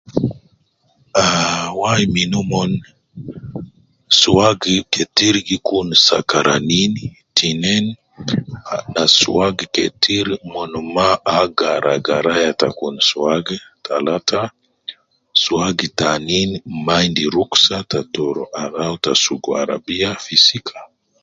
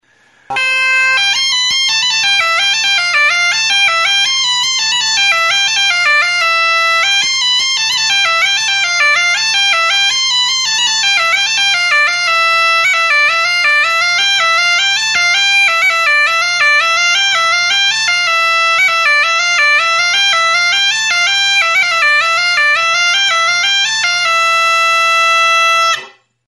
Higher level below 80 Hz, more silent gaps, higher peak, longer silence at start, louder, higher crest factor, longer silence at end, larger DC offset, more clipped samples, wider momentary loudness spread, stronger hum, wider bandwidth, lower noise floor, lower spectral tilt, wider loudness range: first, -46 dBFS vs -64 dBFS; neither; about the same, 0 dBFS vs -2 dBFS; second, 0.1 s vs 0.5 s; second, -16 LUFS vs -9 LUFS; first, 18 dB vs 10 dB; about the same, 0.4 s vs 0.4 s; neither; neither; first, 14 LU vs 2 LU; neither; second, 7.8 kHz vs 12 kHz; first, -59 dBFS vs -50 dBFS; first, -3.5 dB/octave vs 2.5 dB/octave; first, 4 LU vs 1 LU